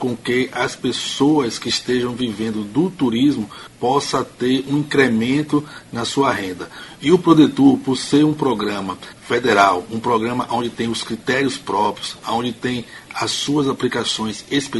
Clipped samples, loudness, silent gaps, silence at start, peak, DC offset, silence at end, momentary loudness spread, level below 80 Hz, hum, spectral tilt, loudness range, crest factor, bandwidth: under 0.1%; -19 LUFS; none; 0 s; 0 dBFS; under 0.1%; 0 s; 10 LU; -54 dBFS; none; -5 dB/octave; 5 LU; 18 dB; 11.5 kHz